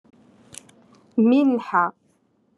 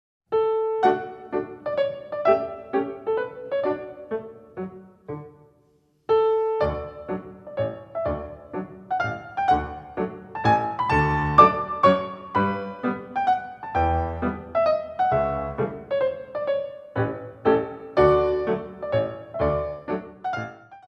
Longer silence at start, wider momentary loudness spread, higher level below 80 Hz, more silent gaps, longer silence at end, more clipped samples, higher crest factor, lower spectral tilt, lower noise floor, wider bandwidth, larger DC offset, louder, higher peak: first, 1.15 s vs 0.3 s; first, 25 LU vs 14 LU; second, -78 dBFS vs -44 dBFS; neither; first, 0.65 s vs 0.1 s; neither; second, 16 dB vs 24 dB; second, -6.5 dB/octave vs -8 dB/octave; about the same, -64 dBFS vs -63 dBFS; first, 11.5 kHz vs 8.4 kHz; neither; first, -20 LUFS vs -24 LUFS; second, -6 dBFS vs -2 dBFS